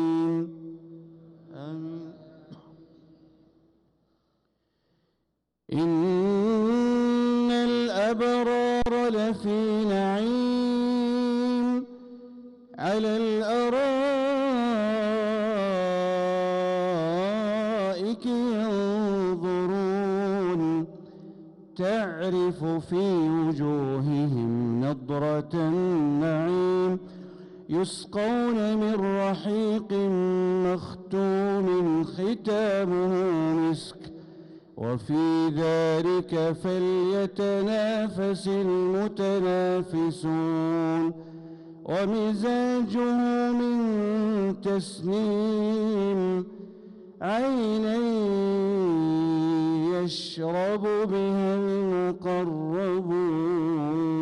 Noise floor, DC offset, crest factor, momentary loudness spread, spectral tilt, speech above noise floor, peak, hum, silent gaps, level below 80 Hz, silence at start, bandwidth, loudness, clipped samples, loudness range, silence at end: -78 dBFS; under 0.1%; 8 dB; 8 LU; -7 dB/octave; 53 dB; -18 dBFS; none; none; -58 dBFS; 0 s; 11.5 kHz; -26 LUFS; under 0.1%; 3 LU; 0 s